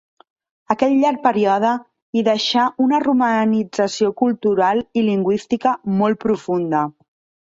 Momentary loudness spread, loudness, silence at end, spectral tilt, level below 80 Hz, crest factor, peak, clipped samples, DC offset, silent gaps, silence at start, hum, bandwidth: 5 LU; -18 LUFS; 0.5 s; -5.5 dB/octave; -60 dBFS; 16 dB; -2 dBFS; under 0.1%; under 0.1%; 2.02-2.13 s; 0.7 s; none; 7.8 kHz